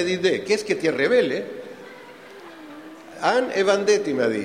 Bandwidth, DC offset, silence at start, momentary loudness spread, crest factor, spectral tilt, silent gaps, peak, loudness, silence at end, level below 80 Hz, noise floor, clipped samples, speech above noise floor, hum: 13.5 kHz; under 0.1%; 0 s; 22 LU; 20 dB; -4 dB/octave; none; -4 dBFS; -21 LUFS; 0 s; -68 dBFS; -42 dBFS; under 0.1%; 22 dB; none